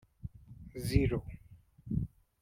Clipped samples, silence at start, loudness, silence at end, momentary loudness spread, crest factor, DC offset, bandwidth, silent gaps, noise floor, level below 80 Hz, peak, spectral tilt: under 0.1%; 0.25 s; -35 LUFS; 0.35 s; 23 LU; 22 dB; under 0.1%; 16 kHz; none; -56 dBFS; -44 dBFS; -14 dBFS; -7 dB/octave